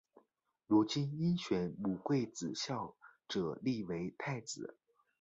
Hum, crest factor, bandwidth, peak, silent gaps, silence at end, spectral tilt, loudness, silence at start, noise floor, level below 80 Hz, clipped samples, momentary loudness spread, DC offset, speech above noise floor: none; 20 dB; 8 kHz; -18 dBFS; none; 0.5 s; -6 dB/octave; -37 LUFS; 0.7 s; -78 dBFS; -70 dBFS; under 0.1%; 10 LU; under 0.1%; 42 dB